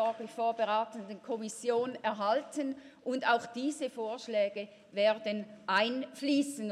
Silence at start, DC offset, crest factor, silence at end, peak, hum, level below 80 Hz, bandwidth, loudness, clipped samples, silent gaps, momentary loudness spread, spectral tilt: 0 s; under 0.1%; 18 dB; 0 s; -14 dBFS; none; -86 dBFS; 14 kHz; -33 LUFS; under 0.1%; none; 9 LU; -3.5 dB/octave